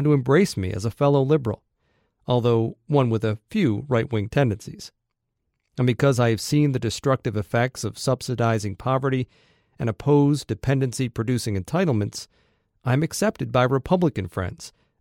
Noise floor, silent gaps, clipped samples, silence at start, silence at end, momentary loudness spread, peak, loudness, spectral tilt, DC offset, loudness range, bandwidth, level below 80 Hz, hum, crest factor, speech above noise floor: -78 dBFS; none; under 0.1%; 0 s; 0.3 s; 12 LU; -6 dBFS; -23 LUFS; -6.5 dB/octave; under 0.1%; 2 LU; 16.5 kHz; -52 dBFS; none; 18 dB; 56 dB